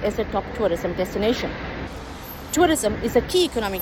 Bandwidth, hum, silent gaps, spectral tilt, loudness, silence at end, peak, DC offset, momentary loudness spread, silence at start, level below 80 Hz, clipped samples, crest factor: 17.5 kHz; none; none; -4.5 dB/octave; -23 LUFS; 0 s; -4 dBFS; under 0.1%; 14 LU; 0 s; -38 dBFS; under 0.1%; 18 dB